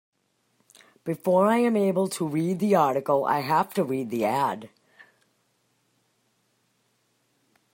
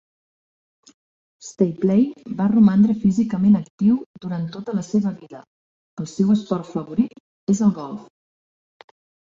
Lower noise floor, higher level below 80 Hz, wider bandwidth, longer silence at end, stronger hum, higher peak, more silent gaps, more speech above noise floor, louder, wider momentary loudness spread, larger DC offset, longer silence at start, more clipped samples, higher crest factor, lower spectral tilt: second, -70 dBFS vs under -90 dBFS; second, -74 dBFS vs -60 dBFS; first, 16.5 kHz vs 7.6 kHz; first, 3.05 s vs 1.25 s; neither; second, -8 dBFS vs -4 dBFS; second, none vs 3.70-3.78 s, 4.06-4.14 s, 5.47-5.97 s, 7.20-7.47 s; second, 47 dB vs over 71 dB; second, -24 LUFS vs -20 LUFS; second, 8 LU vs 17 LU; neither; second, 1.05 s vs 1.45 s; neither; about the same, 18 dB vs 16 dB; second, -6.5 dB/octave vs -8 dB/octave